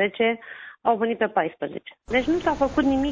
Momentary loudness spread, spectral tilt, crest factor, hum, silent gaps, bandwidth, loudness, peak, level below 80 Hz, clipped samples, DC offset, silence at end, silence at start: 11 LU; -6 dB/octave; 16 dB; none; none; 7.6 kHz; -24 LUFS; -8 dBFS; -46 dBFS; under 0.1%; under 0.1%; 0 s; 0 s